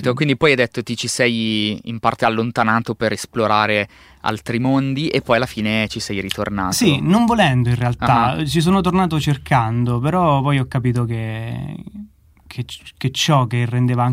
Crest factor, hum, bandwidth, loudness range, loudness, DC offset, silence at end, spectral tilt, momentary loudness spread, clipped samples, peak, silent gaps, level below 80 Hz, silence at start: 18 dB; none; 16 kHz; 5 LU; -18 LUFS; under 0.1%; 0 s; -5.5 dB/octave; 11 LU; under 0.1%; 0 dBFS; none; -44 dBFS; 0 s